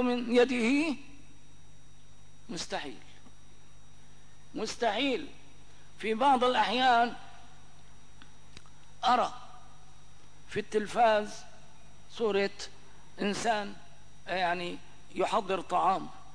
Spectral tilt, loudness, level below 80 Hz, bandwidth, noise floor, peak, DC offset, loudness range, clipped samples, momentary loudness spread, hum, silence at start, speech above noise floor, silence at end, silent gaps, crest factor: -4 dB/octave; -30 LUFS; -62 dBFS; 10.5 kHz; -58 dBFS; -14 dBFS; 0.8%; 8 LU; under 0.1%; 19 LU; 50 Hz at -60 dBFS; 0 s; 29 dB; 0.15 s; none; 18 dB